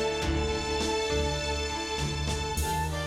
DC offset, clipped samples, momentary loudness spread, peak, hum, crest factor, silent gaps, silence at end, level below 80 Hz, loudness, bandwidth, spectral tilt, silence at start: under 0.1%; under 0.1%; 3 LU; -16 dBFS; none; 14 dB; none; 0 s; -38 dBFS; -29 LUFS; 16 kHz; -4 dB/octave; 0 s